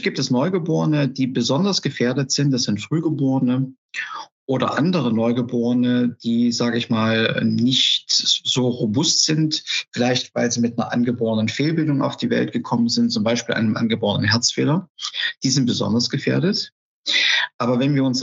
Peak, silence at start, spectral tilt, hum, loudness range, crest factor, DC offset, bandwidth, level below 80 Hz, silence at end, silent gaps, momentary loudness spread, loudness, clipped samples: -2 dBFS; 0 s; -4.5 dB/octave; none; 3 LU; 18 dB; under 0.1%; 8 kHz; -70 dBFS; 0 s; 3.78-3.89 s, 4.32-4.47 s, 14.90-14.95 s, 16.72-17.04 s, 17.54-17.59 s; 6 LU; -20 LUFS; under 0.1%